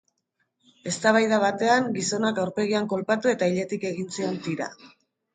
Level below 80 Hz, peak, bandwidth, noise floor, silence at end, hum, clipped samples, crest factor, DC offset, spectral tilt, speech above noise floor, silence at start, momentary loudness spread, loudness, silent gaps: -70 dBFS; -6 dBFS; 9.6 kHz; -75 dBFS; 0.45 s; none; under 0.1%; 20 dB; under 0.1%; -4.5 dB/octave; 51 dB; 0.85 s; 10 LU; -24 LUFS; none